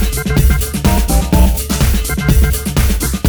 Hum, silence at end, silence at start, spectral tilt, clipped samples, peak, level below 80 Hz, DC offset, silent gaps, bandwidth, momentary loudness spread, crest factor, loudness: none; 0 s; 0 s; -5 dB/octave; under 0.1%; -2 dBFS; -14 dBFS; under 0.1%; none; over 20 kHz; 2 LU; 10 dB; -14 LUFS